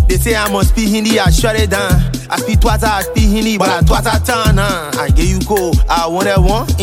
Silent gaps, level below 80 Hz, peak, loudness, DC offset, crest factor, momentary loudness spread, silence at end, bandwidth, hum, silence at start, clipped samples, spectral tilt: none; -16 dBFS; 0 dBFS; -13 LUFS; under 0.1%; 12 dB; 3 LU; 0 s; 16.5 kHz; none; 0 s; under 0.1%; -5 dB/octave